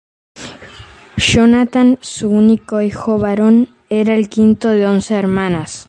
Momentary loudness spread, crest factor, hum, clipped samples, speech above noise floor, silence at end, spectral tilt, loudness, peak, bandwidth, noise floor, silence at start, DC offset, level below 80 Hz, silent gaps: 8 LU; 12 dB; none; under 0.1%; 25 dB; 0.05 s; -5.5 dB/octave; -13 LUFS; 0 dBFS; 9.6 kHz; -38 dBFS; 0.35 s; under 0.1%; -40 dBFS; none